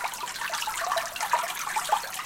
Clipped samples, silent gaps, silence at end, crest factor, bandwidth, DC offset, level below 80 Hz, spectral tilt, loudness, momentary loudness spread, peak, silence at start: under 0.1%; none; 0 s; 18 dB; 17 kHz; under 0.1%; -64 dBFS; 1 dB/octave; -29 LUFS; 4 LU; -12 dBFS; 0 s